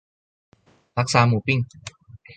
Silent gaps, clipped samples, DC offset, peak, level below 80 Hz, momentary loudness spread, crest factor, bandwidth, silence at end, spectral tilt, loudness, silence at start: none; under 0.1%; under 0.1%; -4 dBFS; -54 dBFS; 21 LU; 20 dB; 9.4 kHz; 0.05 s; -5.5 dB/octave; -21 LUFS; 0.95 s